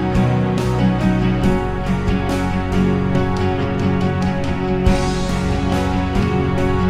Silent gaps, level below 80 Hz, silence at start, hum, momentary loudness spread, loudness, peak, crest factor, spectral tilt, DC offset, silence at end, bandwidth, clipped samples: none; -26 dBFS; 0 s; none; 3 LU; -18 LUFS; -2 dBFS; 14 dB; -7 dB/octave; under 0.1%; 0 s; 12.5 kHz; under 0.1%